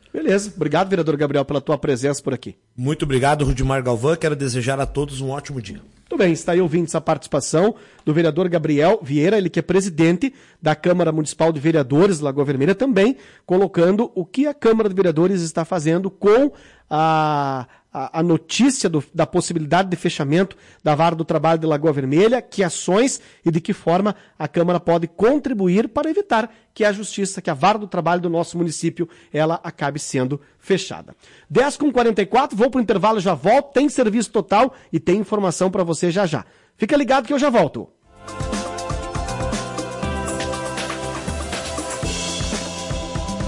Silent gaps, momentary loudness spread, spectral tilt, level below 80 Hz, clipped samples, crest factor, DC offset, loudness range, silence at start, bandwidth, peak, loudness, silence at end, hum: none; 10 LU; -5.5 dB/octave; -42 dBFS; under 0.1%; 12 dB; under 0.1%; 5 LU; 0.15 s; 11.5 kHz; -8 dBFS; -20 LUFS; 0 s; none